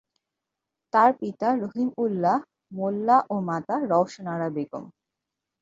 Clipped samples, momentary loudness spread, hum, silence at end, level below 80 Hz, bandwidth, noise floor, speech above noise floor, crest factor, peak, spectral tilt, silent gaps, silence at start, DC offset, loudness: under 0.1%; 11 LU; none; 0.7 s; -72 dBFS; 7.8 kHz; -85 dBFS; 61 dB; 20 dB; -6 dBFS; -7.5 dB/octave; none; 0.95 s; under 0.1%; -25 LUFS